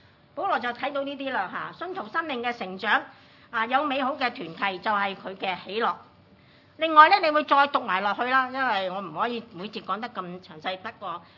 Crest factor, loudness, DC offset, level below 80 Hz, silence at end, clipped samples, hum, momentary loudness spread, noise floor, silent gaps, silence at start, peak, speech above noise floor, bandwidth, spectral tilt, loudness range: 24 dB; -25 LUFS; under 0.1%; -76 dBFS; 0.15 s; under 0.1%; none; 14 LU; -56 dBFS; none; 0.35 s; -2 dBFS; 30 dB; 6 kHz; -5.5 dB/octave; 7 LU